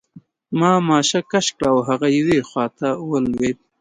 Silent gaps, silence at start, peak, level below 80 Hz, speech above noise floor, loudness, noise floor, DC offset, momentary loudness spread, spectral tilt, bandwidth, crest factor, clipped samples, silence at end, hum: none; 0.15 s; -2 dBFS; -52 dBFS; 29 dB; -19 LUFS; -48 dBFS; under 0.1%; 7 LU; -4.5 dB/octave; 11 kHz; 16 dB; under 0.1%; 0.25 s; none